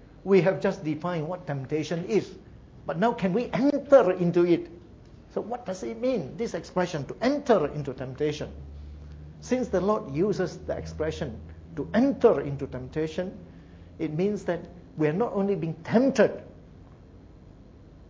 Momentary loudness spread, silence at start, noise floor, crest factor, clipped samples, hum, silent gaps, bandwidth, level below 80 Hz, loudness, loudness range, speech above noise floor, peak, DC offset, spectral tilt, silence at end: 16 LU; 0 s; -50 dBFS; 20 dB; under 0.1%; none; none; 7.8 kHz; -50 dBFS; -27 LUFS; 5 LU; 24 dB; -6 dBFS; under 0.1%; -7 dB/octave; 0.05 s